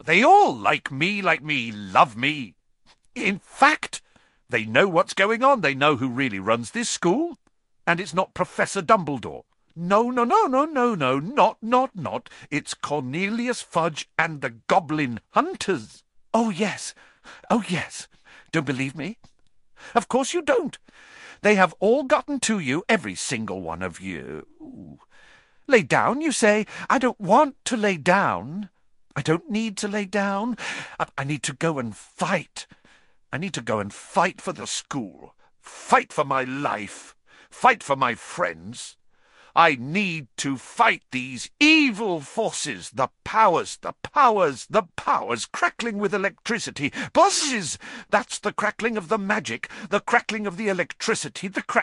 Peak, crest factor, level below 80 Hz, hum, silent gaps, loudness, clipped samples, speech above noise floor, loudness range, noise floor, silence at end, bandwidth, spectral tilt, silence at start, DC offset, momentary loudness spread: -2 dBFS; 22 dB; -62 dBFS; none; none; -23 LUFS; under 0.1%; 36 dB; 6 LU; -60 dBFS; 0 s; 11.5 kHz; -4 dB/octave; 0.05 s; under 0.1%; 13 LU